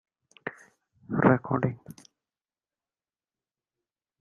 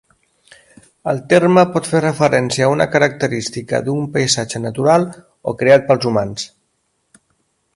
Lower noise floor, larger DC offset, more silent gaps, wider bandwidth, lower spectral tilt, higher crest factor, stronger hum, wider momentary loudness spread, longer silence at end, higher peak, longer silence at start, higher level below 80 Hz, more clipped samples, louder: first, under -90 dBFS vs -67 dBFS; neither; neither; about the same, 11.5 kHz vs 11.5 kHz; first, -9 dB/octave vs -5 dB/octave; first, 26 dB vs 16 dB; neither; first, 18 LU vs 13 LU; first, 2.3 s vs 1.3 s; second, -6 dBFS vs 0 dBFS; second, 0.45 s vs 1.05 s; second, -64 dBFS vs -54 dBFS; neither; second, -26 LUFS vs -15 LUFS